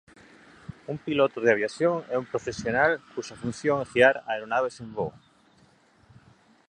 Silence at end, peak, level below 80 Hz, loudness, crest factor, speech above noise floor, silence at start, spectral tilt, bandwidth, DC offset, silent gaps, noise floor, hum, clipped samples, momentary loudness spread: 1.6 s; -4 dBFS; -60 dBFS; -26 LUFS; 22 dB; 34 dB; 0.7 s; -5 dB/octave; 9.8 kHz; under 0.1%; none; -60 dBFS; none; under 0.1%; 15 LU